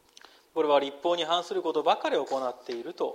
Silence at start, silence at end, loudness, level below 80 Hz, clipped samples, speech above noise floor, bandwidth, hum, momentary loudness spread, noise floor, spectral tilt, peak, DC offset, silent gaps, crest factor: 0.55 s; 0 s; -28 LUFS; -80 dBFS; under 0.1%; 28 dB; 14.5 kHz; none; 10 LU; -56 dBFS; -3.5 dB/octave; -10 dBFS; under 0.1%; none; 18 dB